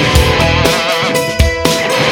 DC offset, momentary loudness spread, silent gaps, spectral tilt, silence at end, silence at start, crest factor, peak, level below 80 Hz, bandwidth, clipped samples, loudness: under 0.1%; 3 LU; none; -4 dB/octave; 0 s; 0 s; 12 dB; 0 dBFS; -20 dBFS; over 20 kHz; 0.2%; -11 LUFS